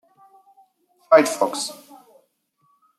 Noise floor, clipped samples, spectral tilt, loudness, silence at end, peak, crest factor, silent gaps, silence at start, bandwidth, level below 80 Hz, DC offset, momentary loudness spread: -67 dBFS; under 0.1%; -2.5 dB/octave; -19 LUFS; 1.25 s; -2 dBFS; 22 dB; none; 1.1 s; 14.5 kHz; -80 dBFS; under 0.1%; 16 LU